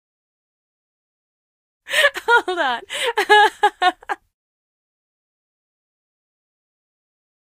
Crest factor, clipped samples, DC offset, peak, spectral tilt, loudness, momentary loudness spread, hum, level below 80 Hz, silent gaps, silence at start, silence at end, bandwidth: 22 dB; under 0.1%; under 0.1%; 0 dBFS; 0 dB/octave; -17 LUFS; 13 LU; none; -66 dBFS; none; 1.9 s; 3.3 s; 15.5 kHz